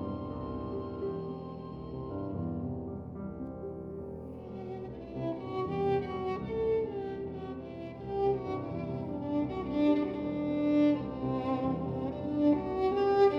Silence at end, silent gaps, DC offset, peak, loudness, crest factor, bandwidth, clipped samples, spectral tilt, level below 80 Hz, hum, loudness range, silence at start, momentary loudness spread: 0 s; none; under 0.1%; -16 dBFS; -34 LUFS; 18 dB; 6 kHz; under 0.1%; -9.5 dB/octave; -54 dBFS; none; 9 LU; 0 s; 13 LU